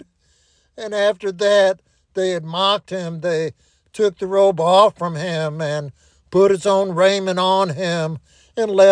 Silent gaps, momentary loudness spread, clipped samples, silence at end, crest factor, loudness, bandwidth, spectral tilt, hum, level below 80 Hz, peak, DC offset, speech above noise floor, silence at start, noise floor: none; 14 LU; under 0.1%; 0 s; 18 dB; -18 LUFS; 10.5 kHz; -5 dB/octave; none; -60 dBFS; -2 dBFS; under 0.1%; 43 dB; 0.8 s; -60 dBFS